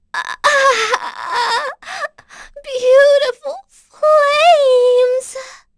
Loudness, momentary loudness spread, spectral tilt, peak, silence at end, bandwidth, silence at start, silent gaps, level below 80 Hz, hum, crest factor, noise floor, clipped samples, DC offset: -13 LUFS; 18 LU; 0.5 dB/octave; 0 dBFS; 0.25 s; 11 kHz; 0.15 s; none; -56 dBFS; none; 14 dB; -40 dBFS; under 0.1%; under 0.1%